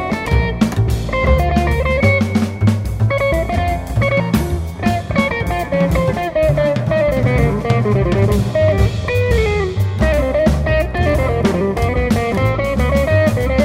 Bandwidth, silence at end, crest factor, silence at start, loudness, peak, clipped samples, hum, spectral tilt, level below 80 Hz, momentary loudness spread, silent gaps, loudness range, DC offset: 16 kHz; 0 s; 14 dB; 0 s; -16 LUFS; 0 dBFS; under 0.1%; none; -7 dB/octave; -22 dBFS; 3 LU; none; 2 LU; under 0.1%